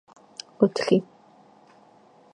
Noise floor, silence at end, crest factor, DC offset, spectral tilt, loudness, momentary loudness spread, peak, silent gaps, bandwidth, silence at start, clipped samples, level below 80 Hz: -55 dBFS; 1.3 s; 24 dB; under 0.1%; -6 dB/octave; -23 LUFS; 20 LU; -4 dBFS; none; 11 kHz; 0.6 s; under 0.1%; -72 dBFS